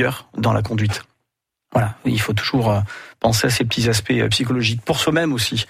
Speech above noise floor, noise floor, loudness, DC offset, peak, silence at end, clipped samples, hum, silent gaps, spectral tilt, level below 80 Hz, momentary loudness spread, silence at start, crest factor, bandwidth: 59 dB; -78 dBFS; -19 LUFS; under 0.1%; -4 dBFS; 0.05 s; under 0.1%; none; none; -4.5 dB/octave; -44 dBFS; 5 LU; 0 s; 14 dB; 16 kHz